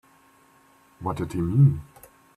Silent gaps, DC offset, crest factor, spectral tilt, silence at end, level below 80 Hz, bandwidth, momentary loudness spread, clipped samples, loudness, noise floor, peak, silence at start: none; under 0.1%; 18 dB; -9.5 dB/octave; 0.55 s; -52 dBFS; 12.5 kHz; 15 LU; under 0.1%; -24 LUFS; -58 dBFS; -8 dBFS; 1 s